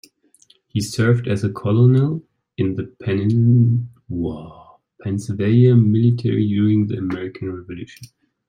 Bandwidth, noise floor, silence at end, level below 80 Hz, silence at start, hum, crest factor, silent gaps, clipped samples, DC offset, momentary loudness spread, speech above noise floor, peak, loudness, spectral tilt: 11 kHz; -56 dBFS; 0.45 s; -54 dBFS; 0.75 s; none; 16 dB; none; under 0.1%; under 0.1%; 16 LU; 38 dB; -2 dBFS; -18 LUFS; -8 dB/octave